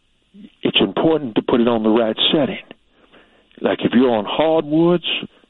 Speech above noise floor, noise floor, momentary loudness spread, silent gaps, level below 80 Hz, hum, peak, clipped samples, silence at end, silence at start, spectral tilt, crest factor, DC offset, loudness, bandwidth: 35 dB; -52 dBFS; 7 LU; none; -54 dBFS; none; -2 dBFS; under 0.1%; 0.25 s; 0.4 s; -9 dB/octave; 16 dB; under 0.1%; -17 LUFS; 4.2 kHz